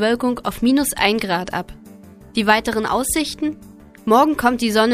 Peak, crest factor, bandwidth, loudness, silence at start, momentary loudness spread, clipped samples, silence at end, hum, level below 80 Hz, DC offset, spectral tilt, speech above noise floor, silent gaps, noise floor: 0 dBFS; 18 dB; 15.5 kHz; -18 LUFS; 0 s; 11 LU; under 0.1%; 0 s; none; -44 dBFS; under 0.1%; -3.5 dB/octave; 24 dB; none; -42 dBFS